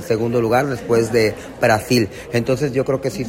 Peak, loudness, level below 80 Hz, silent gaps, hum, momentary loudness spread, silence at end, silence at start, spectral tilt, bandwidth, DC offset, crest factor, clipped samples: -4 dBFS; -18 LUFS; -46 dBFS; none; none; 5 LU; 0 s; 0 s; -5.5 dB/octave; 16.5 kHz; under 0.1%; 14 dB; under 0.1%